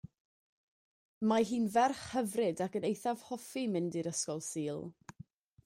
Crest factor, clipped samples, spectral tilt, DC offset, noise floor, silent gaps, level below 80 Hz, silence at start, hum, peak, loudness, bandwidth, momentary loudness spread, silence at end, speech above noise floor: 20 dB; under 0.1%; -4.5 dB/octave; under 0.1%; -57 dBFS; none; -74 dBFS; 1.2 s; none; -16 dBFS; -35 LUFS; 16 kHz; 11 LU; 0.75 s; 23 dB